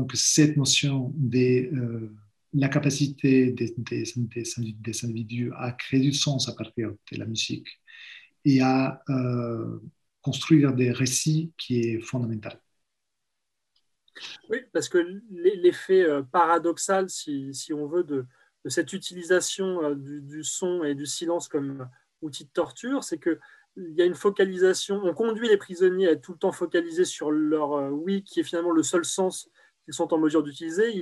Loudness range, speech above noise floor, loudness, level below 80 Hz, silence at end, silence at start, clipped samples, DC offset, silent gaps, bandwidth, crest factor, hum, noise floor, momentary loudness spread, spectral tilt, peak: 6 LU; 58 dB; -25 LUFS; -72 dBFS; 0 s; 0 s; under 0.1%; under 0.1%; none; 12.5 kHz; 20 dB; none; -83 dBFS; 13 LU; -5 dB/octave; -6 dBFS